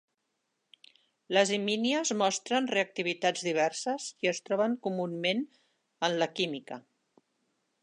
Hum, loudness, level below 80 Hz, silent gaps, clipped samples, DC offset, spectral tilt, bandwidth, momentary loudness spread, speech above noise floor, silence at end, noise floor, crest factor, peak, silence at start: none; -30 LUFS; -84 dBFS; none; under 0.1%; under 0.1%; -3 dB/octave; 11 kHz; 7 LU; 51 dB; 1 s; -81 dBFS; 22 dB; -10 dBFS; 1.3 s